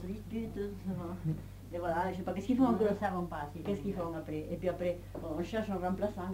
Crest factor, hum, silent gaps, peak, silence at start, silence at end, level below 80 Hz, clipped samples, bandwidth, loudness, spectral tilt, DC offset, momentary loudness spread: 18 dB; none; none; -18 dBFS; 0 s; 0 s; -52 dBFS; under 0.1%; 16 kHz; -36 LUFS; -8 dB/octave; under 0.1%; 10 LU